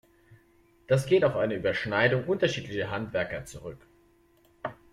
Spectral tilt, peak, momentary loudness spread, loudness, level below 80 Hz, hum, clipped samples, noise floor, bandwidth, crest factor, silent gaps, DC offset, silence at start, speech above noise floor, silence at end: -6 dB/octave; -10 dBFS; 16 LU; -27 LUFS; -58 dBFS; none; under 0.1%; -63 dBFS; 14 kHz; 20 dB; none; under 0.1%; 0.3 s; 36 dB; 0.2 s